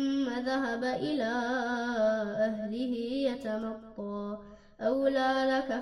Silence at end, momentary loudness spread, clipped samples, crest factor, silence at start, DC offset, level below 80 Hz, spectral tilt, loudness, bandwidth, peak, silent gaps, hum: 0 s; 11 LU; under 0.1%; 14 dB; 0 s; under 0.1%; -62 dBFS; -5.5 dB/octave; -31 LUFS; 10.5 kHz; -16 dBFS; none; none